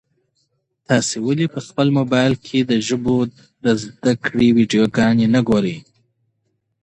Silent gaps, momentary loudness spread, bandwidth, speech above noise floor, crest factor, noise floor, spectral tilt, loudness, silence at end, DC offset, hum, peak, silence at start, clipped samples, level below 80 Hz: none; 6 LU; 9.8 kHz; 53 dB; 16 dB; -70 dBFS; -5.5 dB/octave; -18 LUFS; 1.05 s; under 0.1%; none; -2 dBFS; 0.9 s; under 0.1%; -52 dBFS